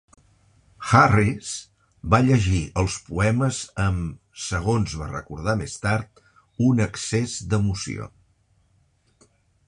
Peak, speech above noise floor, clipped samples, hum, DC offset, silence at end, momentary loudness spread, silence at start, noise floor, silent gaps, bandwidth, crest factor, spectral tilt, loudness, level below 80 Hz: -2 dBFS; 41 dB; under 0.1%; none; under 0.1%; 1.6 s; 16 LU; 0.8 s; -63 dBFS; none; 11 kHz; 22 dB; -5.5 dB/octave; -23 LUFS; -40 dBFS